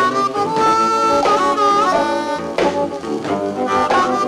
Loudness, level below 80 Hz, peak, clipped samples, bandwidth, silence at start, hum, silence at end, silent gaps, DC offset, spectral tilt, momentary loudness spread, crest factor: -16 LUFS; -50 dBFS; -4 dBFS; under 0.1%; 14 kHz; 0 s; none; 0 s; none; under 0.1%; -4 dB/octave; 7 LU; 12 dB